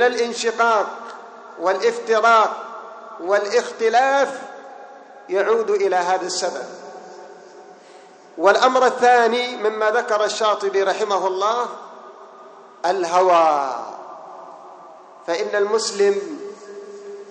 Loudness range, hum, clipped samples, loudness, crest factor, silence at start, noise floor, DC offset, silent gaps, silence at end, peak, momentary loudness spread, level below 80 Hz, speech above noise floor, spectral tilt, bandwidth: 5 LU; none; under 0.1%; -19 LUFS; 20 dB; 0 s; -45 dBFS; under 0.1%; none; 0 s; -2 dBFS; 23 LU; -76 dBFS; 27 dB; -2 dB/octave; 9.6 kHz